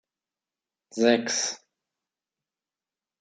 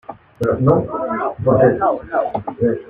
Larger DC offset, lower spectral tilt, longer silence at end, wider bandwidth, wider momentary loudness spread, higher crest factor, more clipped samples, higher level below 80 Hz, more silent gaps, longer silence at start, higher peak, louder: neither; second, -2 dB/octave vs -10 dB/octave; first, 1.65 s vs 0 s; first, 9.4 kHz vs 6.6 kHz; first, 18 LU vs 9 LU; first, 24 dB vs 16 dB; neither; second, -78 dBFS vs -46 dBFS; neither; first, 0.95 s vs 0.1 s; second, -6 dBFS vs -2 dBFS; second, -24 LUFS vs -18 LUFS